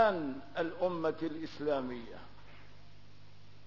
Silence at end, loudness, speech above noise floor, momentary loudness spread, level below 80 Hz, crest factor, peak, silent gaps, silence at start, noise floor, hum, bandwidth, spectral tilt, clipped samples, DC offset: 0.4 s; -36 LUFS; 22 dB; 22 LU; -64 dBFS; 22 dB; -14 dBFS; none; 0 s; -59 dBFS; 50 Hz at -60 dBFS; 6 kHz; -4.5 dB/octave; under 0.1%; 0.4%